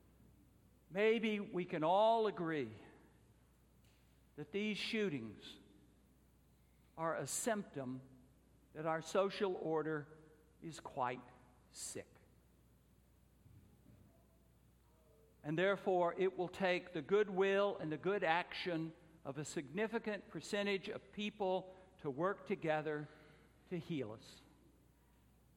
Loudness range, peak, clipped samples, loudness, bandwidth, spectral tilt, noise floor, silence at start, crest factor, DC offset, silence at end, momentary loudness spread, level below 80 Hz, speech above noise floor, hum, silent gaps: 11 LU; -18 dBFS; under 0.1%; -40 LUFS; 16.5 kHz; -4.5 dB/octave; -70 dBFS; 0.9 s; 22 dB; under 0.1%; 1.15 s; 17 LU; -74 dBFS; 31 dB; none; none